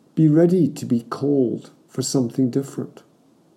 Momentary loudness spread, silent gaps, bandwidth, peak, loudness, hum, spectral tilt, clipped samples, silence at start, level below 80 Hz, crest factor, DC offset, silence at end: 17 LU; none; 15.5 kHz; -6 dBFS; -20 LUFS; none; -7 dB/octave; under 0.1%; 0.15 s; -72 dBFS; 16 dB; under 0.1%; 0.65 s